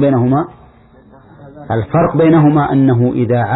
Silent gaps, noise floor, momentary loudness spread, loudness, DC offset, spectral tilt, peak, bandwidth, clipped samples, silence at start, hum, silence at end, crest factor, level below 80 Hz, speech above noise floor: none; -43 dBFS; 10 LU; -12 LUFS; under 0.1%; -13 dB/octave; 0 dBFS; 4.1 kHz; under 0.1%; 0 s; none; 0 s; 12 dB; -42 dBFS; 32 dB